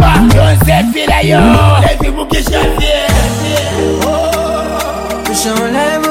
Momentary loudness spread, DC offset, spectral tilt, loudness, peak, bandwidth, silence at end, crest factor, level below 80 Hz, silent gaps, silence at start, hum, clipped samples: 8 LU; under 0.1%; -5 dB/octave; -11 LUFS; 0 dBFS; 17 kHz; 0 s; 10 dB; -18 dBFS; none; 0 s; none; 0.2%